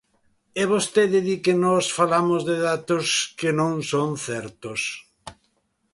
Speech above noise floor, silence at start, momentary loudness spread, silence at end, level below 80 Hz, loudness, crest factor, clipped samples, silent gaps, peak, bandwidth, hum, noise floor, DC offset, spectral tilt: 47 dB; 0.55 s; 10 LU; 0.6 s; -62 dBFS; -22 LUFS; 18 dB; under 0.1%; none; -6 dBFS; 11.5 kHz; none; -69 dBFS; under 0.1%; -4 dB/octave